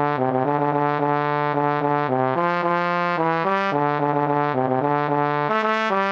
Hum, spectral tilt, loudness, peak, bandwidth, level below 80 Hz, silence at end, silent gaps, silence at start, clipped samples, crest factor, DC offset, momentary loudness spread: none; -7.5 dB/octave; -21 LUFS; -6 dBFS; 7.4 kHz; -70 dBFS; 0 s; none; 0 s; under 0.1%; 14 dB; under 0.1%; 1 LU